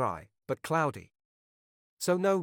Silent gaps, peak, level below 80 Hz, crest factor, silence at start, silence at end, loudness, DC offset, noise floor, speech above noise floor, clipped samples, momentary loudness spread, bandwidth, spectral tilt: 1.25-1.97 s; -16 dBFS; -68 dBFS; 18 dB; 0 s; 0 s; -31 LUFS; under 0.1%; under -90 dBFS; over 60 dB; under 0.1%; 14 LU; 18.5 kHz; -5.5 dB/octave